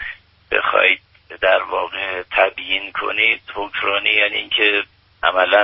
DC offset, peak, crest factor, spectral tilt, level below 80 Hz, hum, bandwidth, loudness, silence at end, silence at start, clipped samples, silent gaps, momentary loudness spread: under 0.1%; 0 dBFS; 18 dB; 2 dB/octave; -52 dBFS; none; 5.8 kHz; -17 LUFS; 0 s; 0 s; under 0.1%; none; 8 LU